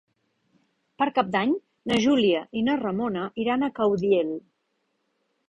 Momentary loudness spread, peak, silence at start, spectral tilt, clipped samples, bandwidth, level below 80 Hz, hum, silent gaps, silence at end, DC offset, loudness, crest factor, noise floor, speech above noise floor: 7 LU; -8 dBFS; 1 s; -5.5 dB/octave; under 0.1%; 10 kHz; -62 dBFS; none; none; 1.1 s; under 0.1%; -25 LUFS; 18 dB; -75 dBFS; 51 dB